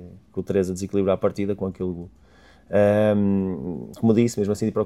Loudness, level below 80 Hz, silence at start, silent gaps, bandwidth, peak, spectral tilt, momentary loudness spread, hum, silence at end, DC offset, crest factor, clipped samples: -23 LUFS; -54 dBFS; 0 s; none; 13.5 kHz; -6 dBFS; -7.5 dB/octave; 13 LU; none; 0 s; under 0.1%; 18 dB; under 0.1%